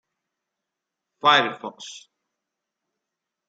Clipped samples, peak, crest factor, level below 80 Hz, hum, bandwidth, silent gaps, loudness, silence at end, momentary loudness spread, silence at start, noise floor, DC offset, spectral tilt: under 0.1%; -4 dBFS; 24 dB; -80 dBFS; none; 9.2 kHz; none; -20 LUFS; 1.5 s; 21 LU; 1.25 s; -84 dBFS; under 0.1%; -2.5 dB/octave